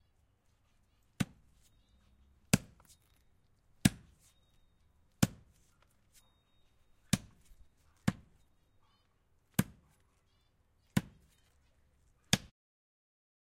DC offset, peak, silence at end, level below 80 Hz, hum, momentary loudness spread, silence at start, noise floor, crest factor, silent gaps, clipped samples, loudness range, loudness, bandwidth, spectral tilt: under 0.1%; -8 dBFS; 1.15 s; -60 dBFS; none; 8 LU; 1.2 s; -72 dBFS; 34 dB; none; under 0.1%; 5 LU; -36 LUFS; 16 kHz; -4.5 dB/octave